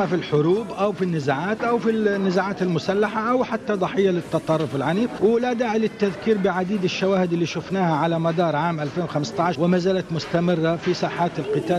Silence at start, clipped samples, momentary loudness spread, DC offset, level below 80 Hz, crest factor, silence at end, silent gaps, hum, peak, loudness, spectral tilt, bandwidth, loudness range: 0 s; under 0.1%; 4 LU; under 0.1%; -56 dBFS; 12 dB; 0 s; none; none; -8 dBFS; -22 LUFS; -6.5 dB/octave; 11 kHz; 1 LU